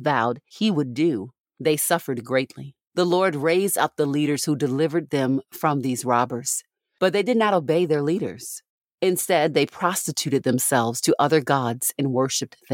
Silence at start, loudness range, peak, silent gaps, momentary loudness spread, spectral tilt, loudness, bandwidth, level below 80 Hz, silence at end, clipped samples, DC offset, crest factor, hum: 0 s; 2 LU; -4 dBFS; 1.40-1.44 s, 8.69-8.81 s, 8.94-8.98 s; 7 LU; -4.5 dB/octave; -22 LUFS; 17 kHz; -72 dBFS; 0 s; under 0.1%; under 0.1%; 18 dB; none